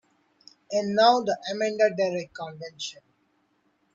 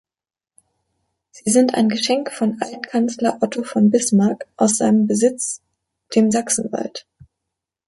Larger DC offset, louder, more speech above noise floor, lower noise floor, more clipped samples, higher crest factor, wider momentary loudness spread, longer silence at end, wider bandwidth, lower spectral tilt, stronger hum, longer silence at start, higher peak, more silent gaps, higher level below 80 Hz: neither; second, -25 LUFS vs -18 LUFS; second, 44 dB vs over 72 dB; second, -69 dBFS vs under -90 dBFS; neither; about the same, 20 dB vs 18 dB; first, 17 LU vs 11 LU; about the same, 1 s vs 0.9 s; second, 7.8 kHz vs 11.5 kHz; about the same, -4 dB/octave vs -4.5 dB/octave; neither; second, 0.7 s vs 1.35 s; second, -6 dBFS vs -2 dBFS; neither; second, -74 dBFS vs -64 dBFS